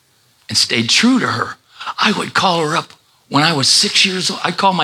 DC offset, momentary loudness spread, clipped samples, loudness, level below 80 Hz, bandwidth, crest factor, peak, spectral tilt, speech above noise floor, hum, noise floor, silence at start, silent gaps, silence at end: under 0.1%; 10 LU; under 0.1%; -14 LUFS; -64 dBFS; 16 kHz; 16 dB; 0 dBFS; -2.5 dB/octave; 28 dB; none; -43 dBFS; 0.5 s; none; 0 s